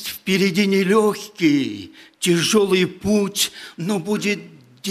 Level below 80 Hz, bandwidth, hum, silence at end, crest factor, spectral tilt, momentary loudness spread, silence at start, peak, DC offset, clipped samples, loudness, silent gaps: -58 dBFS; 15.5 kHz; none; 0 s; 14 dB; -4.5 dB/octave; 10 LU; 0 s; -6 dBFS; under 0.1%; under 0.1%; -19 LUFS; none